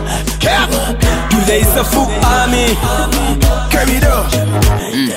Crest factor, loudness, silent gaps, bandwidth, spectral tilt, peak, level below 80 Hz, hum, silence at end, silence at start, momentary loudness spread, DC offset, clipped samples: 12 dB; -12 LUFS; none; 16.5 kHz; -4.5 dB/octave; 0 dBFS; -16 dBFS; none; 0 s; 0 s; 3 LU; under 0.1%; under 0.1%